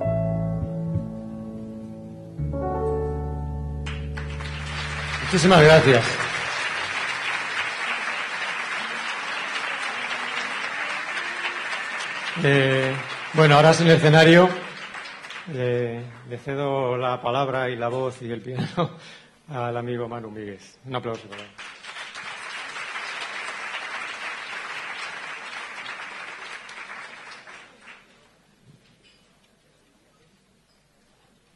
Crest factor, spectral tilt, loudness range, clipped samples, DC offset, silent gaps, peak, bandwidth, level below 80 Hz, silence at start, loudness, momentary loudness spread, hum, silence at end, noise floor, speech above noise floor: 20 dB; -5.5 dB/octave; 16 LU; under 0.1%; under 0.1%; none; -4 dBFS; 11.5 kHz; -44 dBFS; 0 s; -23 LUFS; 21 LU; none; 3.6 s; -62 dBFS; 42 dB